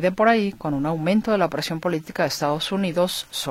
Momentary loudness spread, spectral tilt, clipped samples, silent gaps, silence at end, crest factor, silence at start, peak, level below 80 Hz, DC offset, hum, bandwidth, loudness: 7 LU; -5 dB/octave; under 0.1%; none; 0 s; 18 dB; 0 s; -4 dBFS; -52 dBFS; under 0.1%; none; 16.5 kHz; -22 LUFS